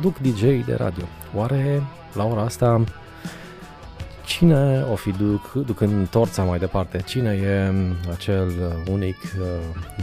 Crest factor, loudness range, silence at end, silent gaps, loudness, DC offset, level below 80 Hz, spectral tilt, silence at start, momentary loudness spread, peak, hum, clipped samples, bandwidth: 20 dB; 3 LU; 0 s; none; -22 LUFS; under 0.1%; -40 dBFS; -7 dB/octave; 0 s; 17 LU; -2 dBFS; none; under 0.1%; 15.5 kHz